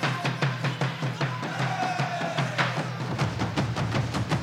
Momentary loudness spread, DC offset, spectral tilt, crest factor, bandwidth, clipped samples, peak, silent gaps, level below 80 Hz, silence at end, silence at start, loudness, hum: 3 LU; under 0.1%; -5.5 dB/octave; 16 dB; 13.5 kHz; under 0.1%; -12 dBFS; none; -50 dBFS; 0 s; 0 s; -28 LUFS; none